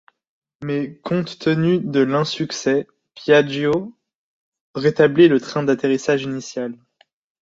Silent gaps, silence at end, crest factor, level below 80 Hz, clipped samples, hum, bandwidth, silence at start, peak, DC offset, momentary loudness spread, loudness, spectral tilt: 4.15-4.52 s, 4.61-4.74 s; 0.65 s; 18 dB; -60 dBFS; under 0.1%; none; 7.8 kHz; 0.6 s; -2 dBFS; under 0.1%; 14 LU; -19 LUFS; -6 dB/octave